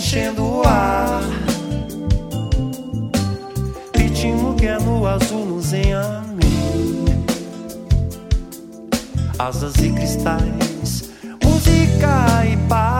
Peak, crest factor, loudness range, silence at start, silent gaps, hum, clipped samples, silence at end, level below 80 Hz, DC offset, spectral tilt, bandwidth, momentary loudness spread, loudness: -2 dBFS; 16 dB; 4 LU; 0 s; none; none; under 0.1%; 0 s; -24 dBFS; under 0.1%; -6 dB/octave; 17 kHz; 10 LU; -19 LUFS